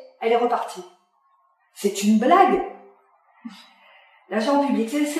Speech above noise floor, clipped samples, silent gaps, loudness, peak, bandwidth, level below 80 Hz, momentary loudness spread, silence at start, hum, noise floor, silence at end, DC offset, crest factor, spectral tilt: 43 dB; under 0.1%; none; -20 LUFS; -4 dBFS; 13.5 kHz; -64 dBFS; 25 LU; 0 s; none; -63 dBFS; 0 s; under 0.1%; 20 dB; -5 dB/octave